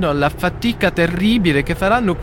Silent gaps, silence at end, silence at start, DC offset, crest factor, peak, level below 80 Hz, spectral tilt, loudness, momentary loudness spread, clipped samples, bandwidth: none; 0 s; 0 s; under 0.1%; 16 dB; -2 dBFS; -32 dBFS; -6.5 dB/octave; -17 LUFS; 4 LU; under 0.1%; 17 kHz